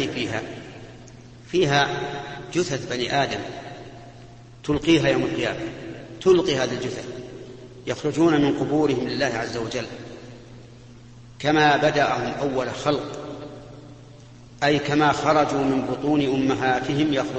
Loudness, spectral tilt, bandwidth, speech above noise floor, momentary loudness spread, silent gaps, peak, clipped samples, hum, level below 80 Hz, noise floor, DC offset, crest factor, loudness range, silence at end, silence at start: -22 LUFS; -5 dB/octave; 8.6 kHz; 23 dB; 21 LU; none; -4 dBFS; under 0.1%; none; -50 dBFS; -45 dBFS; under 0.1%; 18 dB; 3 LU; 0 s; 0 s